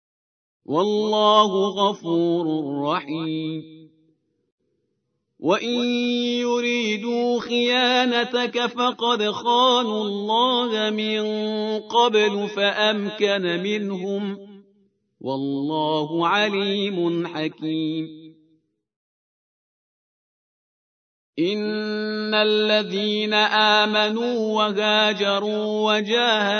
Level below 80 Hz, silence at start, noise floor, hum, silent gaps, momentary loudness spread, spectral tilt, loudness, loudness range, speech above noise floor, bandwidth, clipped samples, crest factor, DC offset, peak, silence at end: -80 dBFS; 0.7 s; -74 dBFS; none; 4.52-4.58 s, 18.96-21.33 s; 9 LU; -4.5 dB/octave; -21 LUFS; 9 LU; 53 dB; 6.6 kHz; under 0.1%; 20 dB; under 0.1%; -2 dBFS; 0 s